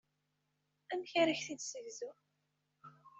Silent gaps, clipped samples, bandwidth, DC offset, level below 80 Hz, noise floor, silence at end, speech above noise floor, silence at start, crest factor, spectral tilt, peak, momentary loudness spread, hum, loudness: none; under 0.1%; 8.2 kHz; under 0.1%; -88 dBFS; -83 dBFS; 0 s; 45 dB; 0.9 s; 22 dB; -2.5 dB/octave; -18 dBFS; 15 LU; none; -38 LUFS